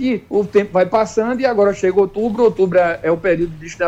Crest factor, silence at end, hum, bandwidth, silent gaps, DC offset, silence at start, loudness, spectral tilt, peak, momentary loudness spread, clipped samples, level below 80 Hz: 12 dB; 0 s; none; 8.2 kHz; none; under 0.1%; 0 s; -16 LUFS; -6.5 dB/octave; -4 dBFS; 4 LU; under 0.1%; -44 dBFS